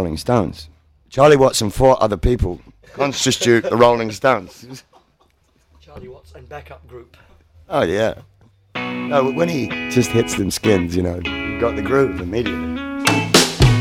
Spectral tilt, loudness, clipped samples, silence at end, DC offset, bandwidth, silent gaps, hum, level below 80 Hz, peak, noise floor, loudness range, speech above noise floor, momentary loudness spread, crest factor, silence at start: -4.5 dB/octave; -17 LUFS; under 0.1%; 0 s; under 0.1%; 16.5 kHz; none; none; -34 dBFS; 0 dBFS; -59 dBFS; 10 LU; 41 dB; 22 LU; 18 dB; 0 s